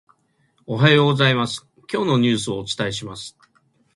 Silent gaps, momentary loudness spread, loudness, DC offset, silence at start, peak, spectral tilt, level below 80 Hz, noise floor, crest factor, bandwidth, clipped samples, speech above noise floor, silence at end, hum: none; 17 LU; -19 LUFS; under 0.1%; 0.7 s; 0 dBFS; -5.5 dB/octave; -56 dBFS; -64 dBFS; 20 dB; 11.5 kHz; under 0.1%; 45 dB; 0.65 s; none